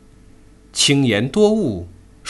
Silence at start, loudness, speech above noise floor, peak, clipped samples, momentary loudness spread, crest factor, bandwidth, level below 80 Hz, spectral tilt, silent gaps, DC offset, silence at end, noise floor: 0.75 s; -17 LUFS; 30 dB; -2 dBFS; under 0.1%; 12 LU; 16 dB; 12 kHz; -46 dBFS; -4 dB/octave; none; under 0.1%; 0 s; -46 dBFS